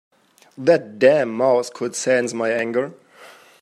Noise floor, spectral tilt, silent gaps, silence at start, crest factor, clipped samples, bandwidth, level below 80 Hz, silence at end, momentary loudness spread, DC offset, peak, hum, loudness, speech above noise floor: -46 dBFS; -4.5 dB/octave; none; 0.6 s; 18 dB; under 0.1%; 12.5 kHz; -72 dBFS; 0.3 s; 9 LU; under 0.1%; -2 dBFS; none; -19 LUFS; 27 dB